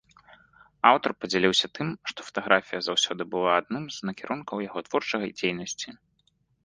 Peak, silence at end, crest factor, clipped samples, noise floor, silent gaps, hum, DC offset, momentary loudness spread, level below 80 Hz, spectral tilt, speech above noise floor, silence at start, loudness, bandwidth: -2 dBFS; 0.7 s; 26 dB; under 0.1%; -70 dBFS; none; none; under 0.1%; 12 LU; -66 dBFS; -3.5 dB/octave; 43 dB; 0.85 s; -26 LUFS; 10.5 kHz